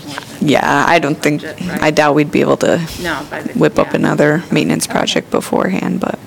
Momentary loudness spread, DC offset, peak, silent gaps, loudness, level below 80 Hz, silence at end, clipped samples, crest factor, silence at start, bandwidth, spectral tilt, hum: 9 LU; under 0.1%; 0 dBFS; none; -14 LUFS; -44 dBFS; 0 s; under 0.1%; 14 dB; 0 s; 18 kHz; -5 dB/octave; none